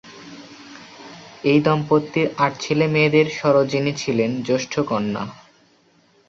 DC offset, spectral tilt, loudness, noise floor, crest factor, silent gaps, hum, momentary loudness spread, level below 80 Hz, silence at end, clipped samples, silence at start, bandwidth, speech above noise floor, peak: under 0.1%; -6 dB/octave; -20 LUFS; -57 dBFS; 18 dB; none; none; 23 LU; -60 dBFS; 0.95 s; under 0.1%; 0.05 s; 7.6 kHz; 38 dB; -4 dBFS